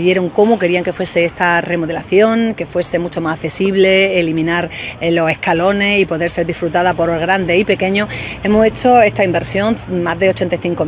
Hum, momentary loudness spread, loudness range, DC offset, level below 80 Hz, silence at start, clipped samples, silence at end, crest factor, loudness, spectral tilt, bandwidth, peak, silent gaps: none; 8 LU; 1 LU; under 0.1%; -40 dBFS; 0 s; under 0.1%; 0 s; 14 dB; -14 LUFS; -10 dB/octave; 4 kHz; 0 dBFS; none